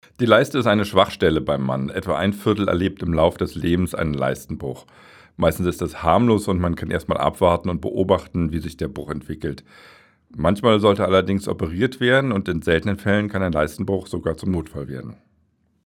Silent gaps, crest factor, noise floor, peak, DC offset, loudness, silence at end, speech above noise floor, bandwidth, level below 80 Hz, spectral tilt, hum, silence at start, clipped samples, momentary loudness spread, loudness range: none; 20 dB; -64 dBFS; 0 dBFS; under 0.1%; -21 LUFS; 0.75 s; 44 dB; 18 kHz; -40 dBFS; -6.5 dB/octave; none; 0.2 s; under 0.1%; 13 LU; 4 LU